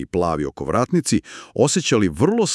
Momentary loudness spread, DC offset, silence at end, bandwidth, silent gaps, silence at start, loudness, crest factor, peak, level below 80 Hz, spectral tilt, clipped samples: 6 LU; under 0.1%; 0 s; 12 kHz; none; 0 s; -20 LUFS; 16 dB; -2 dBFS; -46 dBFS; -5 dB/octave; under 0.1%